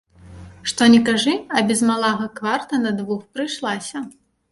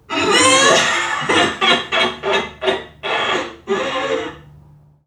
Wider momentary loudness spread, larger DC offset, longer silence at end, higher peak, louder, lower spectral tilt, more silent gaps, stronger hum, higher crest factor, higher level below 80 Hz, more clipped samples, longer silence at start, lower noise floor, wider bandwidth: first, 14 LU vs 11 LU; neither; second, 0.4 s vs 0.65 s; about the same, -2 dBFS vs 0 dBFS; second, -19 LUFS vs -16 LUFS; first, -3.5 dB/octave vs -1.5 dB/octave; neither; neither; about the same, 18 dB vs 16 dB; about the same, -54 dBFS vs -52 dBFS; neither; first, 0.25 s vs 0.1 s; second, -41 dBFS vs -47 dBFS; second, 11.5 kHz vs 15.5 kHz